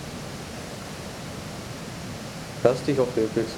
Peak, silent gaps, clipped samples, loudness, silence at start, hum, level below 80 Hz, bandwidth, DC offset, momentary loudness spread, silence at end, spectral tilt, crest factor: -6 dBFS; none; under 0.1%; -29 LUFS; 0 s; none; -52 dBFS; 18.5 kHz; under 0.1%; 12 LU; 0 s; -5.5 dB/octave; 22 dB